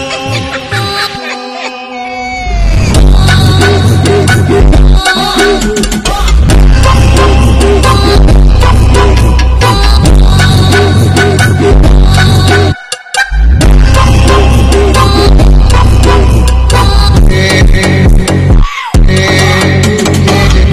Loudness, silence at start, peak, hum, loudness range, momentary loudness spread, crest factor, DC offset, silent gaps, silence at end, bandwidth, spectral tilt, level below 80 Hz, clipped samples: -7 LUFS; 0 s; 0 dBFS; none; 2 LU; 7 LU; 4 dB; under 0.1%; none; 0 s; 13.5 kHz; -5.5 dB/octave; -8 dBFS; 0.8%